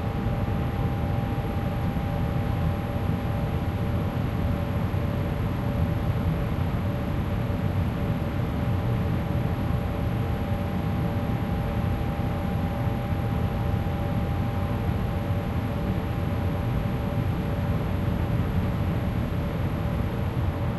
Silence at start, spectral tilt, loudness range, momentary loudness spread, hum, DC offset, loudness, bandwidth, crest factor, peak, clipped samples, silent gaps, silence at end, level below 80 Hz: 0 s; -8 dB/octave; 0 LU; 2 LU; none; under 0.1%; -27 LUFS; 12 kHz; 14 dB; -12 dBFS; under 0.1%; none; 0 s; -34 dBFS